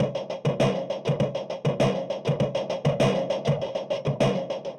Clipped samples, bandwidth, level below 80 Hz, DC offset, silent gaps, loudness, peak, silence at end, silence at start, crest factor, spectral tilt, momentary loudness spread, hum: under 0.1%; 10 kHz; -54 dBFS; under 0.1%; none; -26 LUFS; -10 dBFS; 0 s; 0 s; 16 dB; -6.5 dB/octave; 5 LU; none